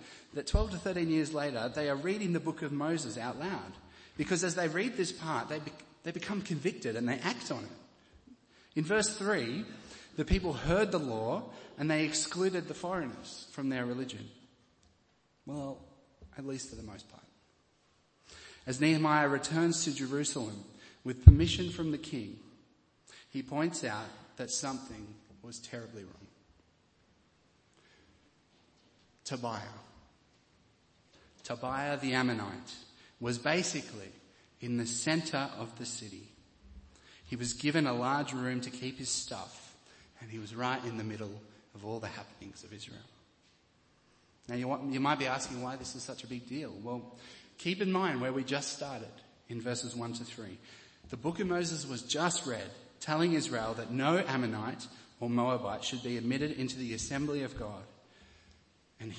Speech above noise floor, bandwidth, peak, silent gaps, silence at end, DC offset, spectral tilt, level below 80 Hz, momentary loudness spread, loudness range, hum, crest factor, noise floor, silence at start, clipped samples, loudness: 37 dB; 8.8 kHz; 0 dBFS; none; 0 s; under 0.1%; -5 dB/octave; -44 dBFS; 18 LU; 18 LU; none; 34 dB; -71 dBFS; 0 s; under 0.1%; -34 LUFS